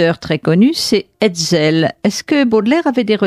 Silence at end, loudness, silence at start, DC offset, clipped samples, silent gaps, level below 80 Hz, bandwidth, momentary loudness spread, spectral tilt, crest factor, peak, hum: 0 s; -14 LUFS; 0 s; under 0.1%; under 0.1%; none; -52 dBFS; 15.5 kHz; 4 LU; -5 dB/octave; 12 dB; -2 dBFS; none